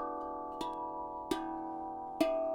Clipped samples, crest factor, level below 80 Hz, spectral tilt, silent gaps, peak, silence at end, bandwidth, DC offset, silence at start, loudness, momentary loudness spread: under 0.1%; 22 dB; -62 dBFS; -4.5 dB/octave; none; -16 dBFS; 0 s; 19 kHz; under 0.1%; 0 s; -39 LUFS; 8 LU